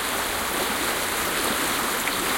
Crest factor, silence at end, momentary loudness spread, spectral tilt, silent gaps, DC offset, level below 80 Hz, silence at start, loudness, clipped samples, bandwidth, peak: 14 dB; 0 s; 2 LU; -1.5 dB/octave; none; under 0.1%; -48 dBFS; 0 s; -23 LUFS; under 0.1%; 17 kHz; -10 dBFS